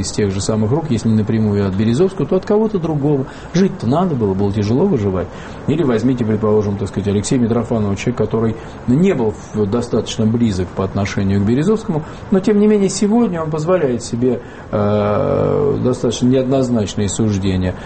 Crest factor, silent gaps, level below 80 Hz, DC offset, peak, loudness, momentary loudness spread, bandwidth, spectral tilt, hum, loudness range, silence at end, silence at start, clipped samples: 12 dB; none; -40 dBFS; under 0.1%; -2 dBFS; -16 LUFS; 5 LU; 8.8 kHz; -7 dB/octave; none; 2 LU; 0 s; 0 s; under 0.1%